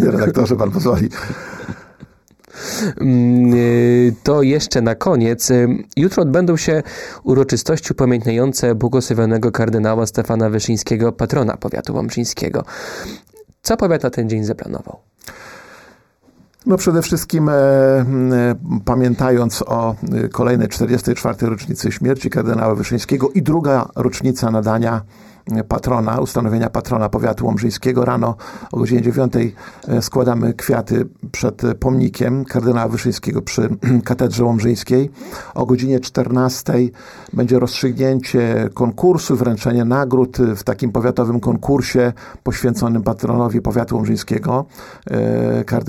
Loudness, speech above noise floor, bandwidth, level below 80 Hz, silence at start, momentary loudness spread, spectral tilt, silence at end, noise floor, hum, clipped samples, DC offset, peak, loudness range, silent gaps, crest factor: -17 LUFS; 36 dB; 17 kHz; -40 dBFS; 0 s; 9 LU; -6.5 dB/octave; 0 s; -52 dBFS; none; under 0.1%; 0.1%; -2 dBFS; 5 LU; none; 16 dB